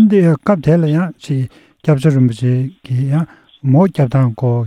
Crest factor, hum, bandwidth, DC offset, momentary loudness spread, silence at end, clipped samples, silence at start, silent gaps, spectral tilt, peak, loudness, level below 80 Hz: 14 dB; none; 10 kHz; under 0.1%; 8 LU; 0 s; under 0.1%; 0 s; none; -9 dB/octave; 0 dBFS; -15 LUFS; -50 dBFS